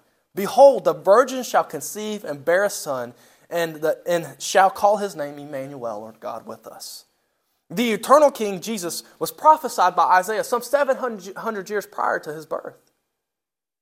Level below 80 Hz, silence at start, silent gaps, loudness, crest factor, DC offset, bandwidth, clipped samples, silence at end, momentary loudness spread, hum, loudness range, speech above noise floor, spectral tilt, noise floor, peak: -72 dBFS; 0.35 s; none; -20 LUFS; 20 dB; under 0.1%; 16 kHz; under 0.1%; 1.1 s; 18 LU; none; 6 LU; 68 dB; -3.5 dB/octave; -88 dBFS; -2 dBFS